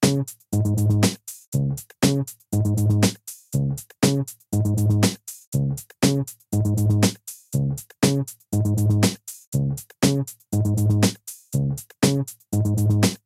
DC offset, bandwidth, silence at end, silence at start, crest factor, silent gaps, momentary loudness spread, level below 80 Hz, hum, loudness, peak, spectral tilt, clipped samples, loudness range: under 0.1%; 16 kHz; 0.1 s; 0 s; 18 dB; 1.47-1.52 s, 5.47-5.52 s, 9.47-9.52 s; 8 LU; -48 dBFS; none; -23 LUFS; -4 dBFS; -5.5 dB/octave; under 0.1%; 1 LU